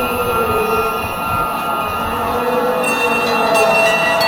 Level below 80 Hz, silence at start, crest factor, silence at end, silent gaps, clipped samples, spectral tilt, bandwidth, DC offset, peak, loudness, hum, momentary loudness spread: -38 dBFS; 0 s; 14 dB; 0 s; none; under 0.1%; -3.5 dB/octave; 19.5 kHz; under 0.1%; -2 dBFS; -15 LUFS; none; 7 LU